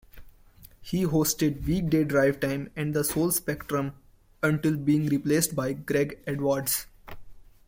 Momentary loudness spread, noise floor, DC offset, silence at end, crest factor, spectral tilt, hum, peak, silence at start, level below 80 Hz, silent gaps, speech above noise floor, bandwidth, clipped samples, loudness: 7 LU; -53 dBFS; under 0.1%; 0.25 s; 18 dB; -5 dB/octave; none; -10 dBFS; 0.15 s; -50 dBFS; none; 27 dB; 16.5 kHz; under 0.1%; -26 LUFS